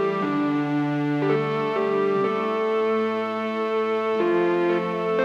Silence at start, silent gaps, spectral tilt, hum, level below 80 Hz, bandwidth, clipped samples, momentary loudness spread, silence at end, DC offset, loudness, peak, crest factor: 0 s; none; -7.5 dB/octave; none; -76 dBFS; 7.6 kHz; under 0.1%; 3 LU; 0 s; under 0.1%; -23 LUFS; -10 dBFS; 12 dB